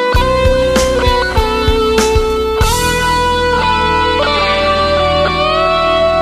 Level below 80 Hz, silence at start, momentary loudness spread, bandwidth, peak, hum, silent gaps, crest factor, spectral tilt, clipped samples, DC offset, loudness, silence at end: -20 dBFS; 0 s; 2 LU; 14.5 kHz; 0 dBFS; none; none; 12 dB; -4 dB/octave; under 0.1%; under 0.1%; -12 LUFS; 0 s